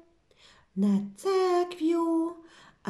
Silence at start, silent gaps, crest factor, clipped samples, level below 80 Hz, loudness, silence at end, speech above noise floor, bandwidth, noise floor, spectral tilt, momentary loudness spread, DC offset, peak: 0.75 s; none; 12 dB; under 0.1%; -72 dBFS; -28 LUFS; 0 s; 34 dB; 12.5 kHz; -60 dBFS; -7 dB/octave; 10 LU; under 0.1%; -16 dBFS